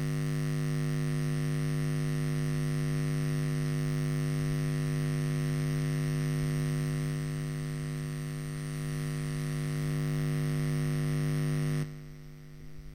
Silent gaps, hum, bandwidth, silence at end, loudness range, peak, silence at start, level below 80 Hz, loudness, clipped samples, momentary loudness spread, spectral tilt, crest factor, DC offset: none; 50 Hz at -30 dBFS; 15.5 kHz; 0 s; 3 LU; -20 dBFS; 0 s; -48 dBFS; -32 LUFS; under 0.1%; 5 LU; -6.5 dB/octave; 10 dB; under 0.1%